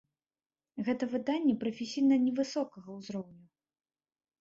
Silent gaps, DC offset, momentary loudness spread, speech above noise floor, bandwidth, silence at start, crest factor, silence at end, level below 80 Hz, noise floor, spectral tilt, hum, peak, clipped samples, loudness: none; under 0.1%; 16 LU; over 59 dB; 7.6 kHz; 0.75 s; 16 dB; 1.05 s; -76 dBFS; under -90 dBFS; -5.5 dB/octave; none; -18 dBFS; under 0.1%; -32 LUFS